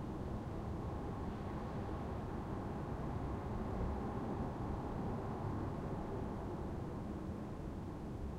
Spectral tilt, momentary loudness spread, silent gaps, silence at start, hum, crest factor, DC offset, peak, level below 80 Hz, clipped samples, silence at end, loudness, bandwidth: -8.5 dB/octave; 3 LU; none; 0 s; none; 14 dB; under 0.1%; -28 dBFS; -50 dBFS; under 0.1%; 0 s; -43 LUFS; 14.5 kHz